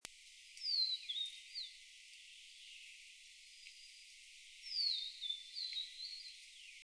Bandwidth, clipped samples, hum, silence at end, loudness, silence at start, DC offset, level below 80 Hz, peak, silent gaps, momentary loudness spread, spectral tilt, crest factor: 11 kHz; under 0.1%; none; 0 s; -41 LUFS; 0.05 s; under 0.1%; -82 dBFS; -22 dBFS; none; 20 LU; 4 dB/octave; 24 dB